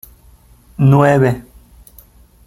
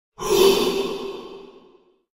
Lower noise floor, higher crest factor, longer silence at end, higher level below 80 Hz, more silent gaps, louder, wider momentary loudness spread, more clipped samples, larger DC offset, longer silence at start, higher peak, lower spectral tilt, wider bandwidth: second, -46 dBFS vs -55 dBFS; about the same, 16 dB vs 20 dB; first, 1.05 s vs 0.65 s; about the same, -44 dBFS vs -48 dBFS; neither; first, -12 LUFS vs -20 LUFS; second, 17 LU vs 20 LU; neither; neither; first, 0.8 s vs 0.2 s; first, 0 dBFS vs -4 dBFS; first, -8.5 dB/octave vs -3 dB/octave; second, 13.5 kHz vs 16 kHz